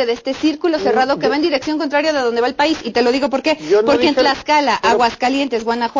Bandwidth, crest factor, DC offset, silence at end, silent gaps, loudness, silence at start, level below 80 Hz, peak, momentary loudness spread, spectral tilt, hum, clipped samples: 7.6 kHz; 12 dB; under 0.1%; 0 s; none; -16 LUFS; 0 s; -50 dBFS; -4 dBFS; 5 LU; -3.5 dB/octave; none; under 0.1%